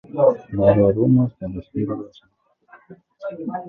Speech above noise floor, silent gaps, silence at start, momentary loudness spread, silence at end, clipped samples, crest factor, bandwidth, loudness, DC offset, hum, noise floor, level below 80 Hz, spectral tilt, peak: 32 dB; none; 0.1 s; 17 LU; 0 s; under 0.1%; 20 dB; 4 kHz; -19 LUFS; under 0.1%; none; -52 dBFS; -46 dBFS; -11.5 dB/octave; -2 dBFS